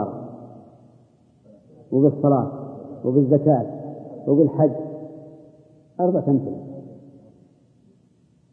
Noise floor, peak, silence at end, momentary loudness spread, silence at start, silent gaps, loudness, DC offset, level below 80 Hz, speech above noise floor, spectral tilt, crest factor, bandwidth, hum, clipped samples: -58 dBFS; -4 dBFS; 1.55 s; 22 LU; 0 s; none; -21 LUFS; under 0.1%; -68 dBFS; 40 dB; -14 dB/octave; 20 dB; 2 kHz; none; under 0.1%